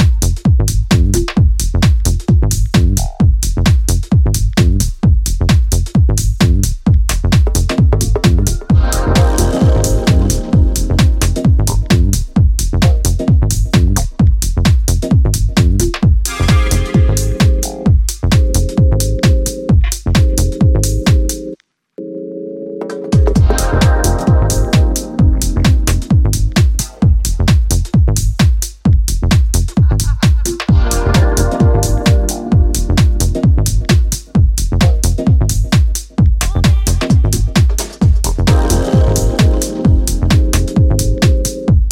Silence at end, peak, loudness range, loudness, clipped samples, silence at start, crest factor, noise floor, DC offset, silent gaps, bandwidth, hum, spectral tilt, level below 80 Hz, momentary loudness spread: 0 s; 0 dBFS; 1 LU; -13 LUFS; under 0.1%; 0 s; 10 dB; -33 dBFS; under 0.1%; none; 16.5 kHz; none; -5.5 dB/octave; -14 dBFS; 2 LU